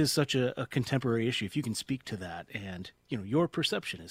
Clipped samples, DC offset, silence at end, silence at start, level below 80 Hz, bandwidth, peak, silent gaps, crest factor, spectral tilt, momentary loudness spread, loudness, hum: under 0.1%; under 0.1%; 0 s; 0 s; -62 dBFS; 16 kHz; -14 dBFS; none; 18 dB; -5 dB/octave; 11 LU; -32 LUFS; none